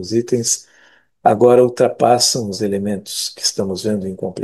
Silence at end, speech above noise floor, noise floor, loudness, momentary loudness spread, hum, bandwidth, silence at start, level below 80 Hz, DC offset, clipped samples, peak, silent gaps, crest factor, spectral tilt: 0 s; 36 dB; -52 dBFS; -16 LUFS; 10 LU; none; 12.5 kHz; 0 s; -60 dBFS; under 0.1%; under 0.1%; 0 dBFS; none; 16 dB; -4 dB/octave